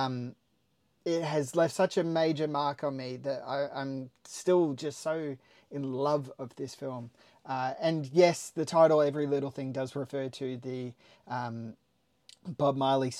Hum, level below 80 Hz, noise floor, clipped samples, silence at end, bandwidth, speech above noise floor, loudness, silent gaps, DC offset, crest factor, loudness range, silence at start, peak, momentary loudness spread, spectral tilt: none; -80 dBFS; -74 dBFS; under 0.1%; 0 s; 15 kHz; 43 dB; -31 LUFS; none; under 0.1%; 20 dB; 7 LU; 0 s; -10 dBFS; 17 LU; -6 dB/octave